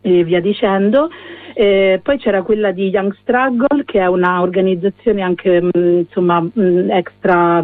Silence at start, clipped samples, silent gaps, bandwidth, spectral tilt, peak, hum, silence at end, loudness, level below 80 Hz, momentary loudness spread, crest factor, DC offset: 0.05 s; under 0.1%; none; 4.1 kHz; -10 dB/octave; 0 dBFS; none; 0 s; -14 LUFS; -48 dBFS; 4 LU; 12 dB; under 0.1%